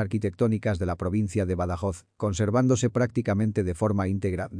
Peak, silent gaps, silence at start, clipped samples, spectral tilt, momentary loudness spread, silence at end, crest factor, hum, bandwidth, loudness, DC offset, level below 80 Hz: -10 dBFS; none; 0 s; under 0.1%; -7 dB/octave; 6 LU; 0 s; 14 dB; none; 10.5 kHz; -26 LUFS; under 0.1%; -48 dBFS